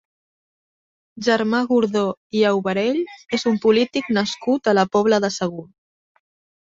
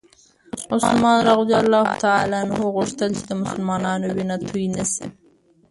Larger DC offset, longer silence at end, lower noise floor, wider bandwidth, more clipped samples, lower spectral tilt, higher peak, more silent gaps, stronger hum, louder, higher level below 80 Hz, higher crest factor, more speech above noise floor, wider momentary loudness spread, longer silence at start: neither; first, 1 s vs 0.6 s; first, under -90 dBFS vs -56 dBFS; second, 7.8 kHz vs 11.5 kHz; neither; about the same, -5 dB/octave vs -5 dB/octave; about the same, -4 dBFS vs -2 dBFS; first, 2.17-2.30 s vs none; neither; about the same, -20 LUFS vs -20 LUFS; second, -62 dBFS vs -54 dBFS; about the same, 18 dB vs 18 dB; first, over 71 dB vs 37 dB; about the same, 8 LU vs 10 LU; first, 1.15 s vs 0.55 s